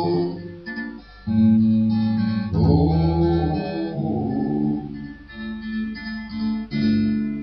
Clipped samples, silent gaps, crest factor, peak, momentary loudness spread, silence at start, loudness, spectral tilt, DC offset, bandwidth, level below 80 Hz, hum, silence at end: under 0.1%; none; 16 dB; -4 dBFS; 15 LU; 0 s; -22 LUFS; -10.5 dB/octave; under 0.1%; 5.6 kHz; -38 dBFS; none; 0 s